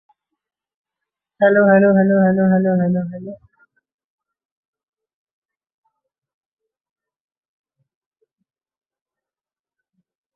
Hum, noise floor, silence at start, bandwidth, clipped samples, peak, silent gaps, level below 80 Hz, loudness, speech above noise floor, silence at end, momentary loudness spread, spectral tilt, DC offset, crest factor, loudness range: none; under -90 dBFS; 1.4 s; 3.5 kHz; under 0.1%; -2 dBFS; none; -64 dBFS; -15 LUFS; over 76 dB; 7 s; 16 LU; -13 dB/octave; under 0.1%; 20 dB; 10 LU